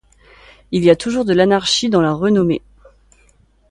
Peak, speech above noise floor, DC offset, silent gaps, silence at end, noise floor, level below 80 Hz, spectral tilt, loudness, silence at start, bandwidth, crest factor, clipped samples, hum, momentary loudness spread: 0 dBFS; 39 dB; under 0.1%; none; 1.1 s; -54 dBFS; -48 dBFS; -5 dB/octave; -15 LUFS; 0.7 s; 11.5 kHz; 16 dB; under 0.1%; none; 6 LU